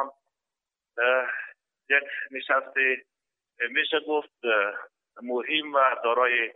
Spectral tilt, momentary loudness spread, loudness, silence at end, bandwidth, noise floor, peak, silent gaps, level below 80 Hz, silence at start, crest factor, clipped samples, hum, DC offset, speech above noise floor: -5 dB/octave; 12 LU; -25 LUFS; 0.05 s; 4.1 kHz; -89 dBFS; -8 dBFS; none; under -90 dBFS; 0 s; 20 dB; under 0.1%; none; under 0.1%; 64 dB